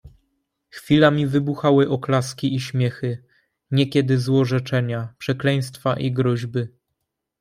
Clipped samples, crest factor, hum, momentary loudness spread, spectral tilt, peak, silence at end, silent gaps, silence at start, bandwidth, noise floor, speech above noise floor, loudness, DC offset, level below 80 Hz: under 0.1%; 18 dB; none; 11 LU; -7 dB/octave; -4 dBFS; 0.7 s; none; 0.05 s; 14.5 kHz; -79 dBFS; 58 dB; -21 LUFS; under 0.1%; -58 dBFS